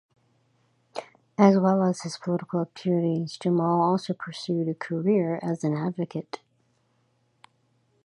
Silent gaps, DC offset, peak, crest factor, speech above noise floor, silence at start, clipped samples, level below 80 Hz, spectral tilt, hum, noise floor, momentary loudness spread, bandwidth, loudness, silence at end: none; under 0.1%; -4 dBFS; 22 dB; 44 dB; 0.95 s; under 0.1%; -72 dBFS; -7.5 dB/octave; none; -69 dBFS; 17 LU; 11 kHz; -25 LUFS; 1.7 s